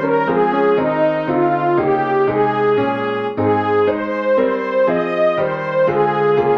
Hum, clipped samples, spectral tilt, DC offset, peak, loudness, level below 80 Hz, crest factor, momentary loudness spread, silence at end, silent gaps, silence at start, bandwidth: none; under 0.1%; -8.5 dB/octave; 0.1%; -4 dBFS; -16 LUFS; -56 dBFS; 12 dB; 3 LU; 0 s; none; 0 s; 6 kHz